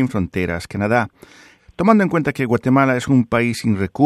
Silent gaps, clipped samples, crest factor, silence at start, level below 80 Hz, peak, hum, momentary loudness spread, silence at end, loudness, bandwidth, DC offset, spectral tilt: none; under 0.1%; 18 dB; 0 s; -48 dBFS; 0 dBFS; none; 7 LU; 0 s; -18 LUFS; 13.5 kHz; under 0.1%; -7 dB/octave